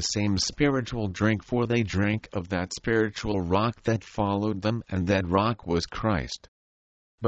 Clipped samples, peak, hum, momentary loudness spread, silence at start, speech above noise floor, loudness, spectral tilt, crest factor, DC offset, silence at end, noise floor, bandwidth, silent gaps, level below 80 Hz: under 0.1%; -10 dBFS; none; 6 LU; 0 s; over 64 dB; -27 LUFS; -5.5 dB/octave; 18 dB; under 0.1%; 0 s; under -90 dBFS; 8.8 kHz; 6.48-7.18 s; -46 dBFS